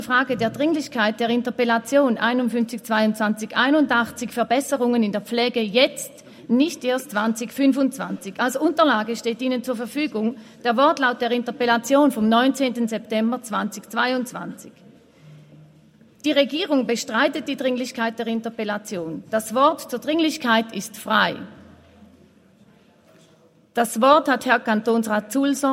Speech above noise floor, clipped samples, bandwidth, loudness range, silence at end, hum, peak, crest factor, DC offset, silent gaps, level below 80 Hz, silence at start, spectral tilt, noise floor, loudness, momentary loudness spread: 34 dB; under 0.1%; 16 kHz; 5 LU; 0 s; none; -2 dBFS; 20 dB; under 0.1%; none; -68 dBFS; 0 s; -4 dB/octave; -55 dBFS; -21 LUFS; 9 LU